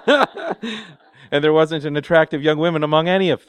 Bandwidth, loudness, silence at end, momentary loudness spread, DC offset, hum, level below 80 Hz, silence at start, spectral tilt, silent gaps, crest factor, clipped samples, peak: 10 kHz; -18 LUFS; 0.1 s; 11 LU; under 0.1%; none; -60 dBFS; 0.05 s; -6.5 dB/octave; none; 18 dB; under 0.1%; 0 dBFS